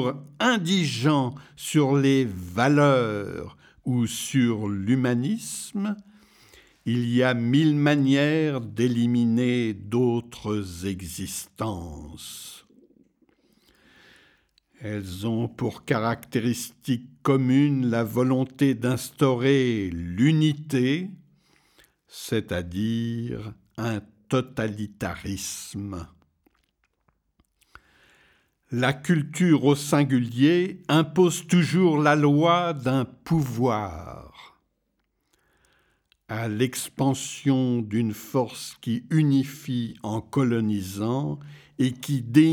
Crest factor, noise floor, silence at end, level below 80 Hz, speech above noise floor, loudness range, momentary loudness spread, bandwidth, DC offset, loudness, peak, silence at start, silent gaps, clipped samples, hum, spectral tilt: 20 dB; -75 dBFS; 0 s; -56 dBFS; 51 dB; 12 LU; 14 LU; 18.5 kHz; under 0.1%; -24 LUFS; -6 dBFS; 0 s; none; under 0.1%; none; -6 dB/octave